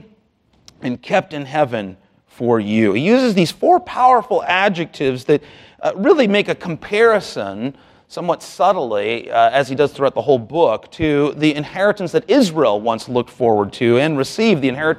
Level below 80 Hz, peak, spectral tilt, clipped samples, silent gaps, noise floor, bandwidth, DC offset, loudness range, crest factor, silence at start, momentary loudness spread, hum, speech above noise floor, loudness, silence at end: -54 dBFS; -2 dBFS; -6 dB/octave; under 0.1%; none; -58 dBFS; 14 kHz; under 0.1%; 3 LU; 16 dB; 0.8 s; 10 LU; none; 42 dB; -17 LUFS; 0 s